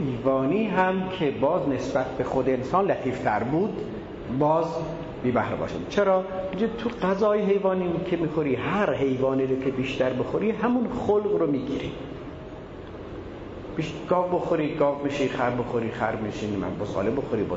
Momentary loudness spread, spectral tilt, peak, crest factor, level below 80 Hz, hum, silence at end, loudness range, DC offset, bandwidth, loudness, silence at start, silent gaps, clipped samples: 12 LU; -7.5 dB/octave; -8 dBFS; 18 dB; -50 dBFS; none; 0 s; 4 LU; under 0.1%; 7.8 kHz; -25 LUFS; 0 s; none; under 0.1%